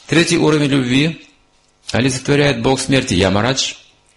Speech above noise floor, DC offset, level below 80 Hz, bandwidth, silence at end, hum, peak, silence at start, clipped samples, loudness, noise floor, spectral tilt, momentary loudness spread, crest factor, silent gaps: 41 dB; under 0.1%; -42 dBFS; 11.5 kHz; 0.4 s; none; -2 dBFS; 0.1 s; under 0.1%; -15 LUFS; -55 dBFS; -4.5 dB/octave; 8 LU; 14 dB; none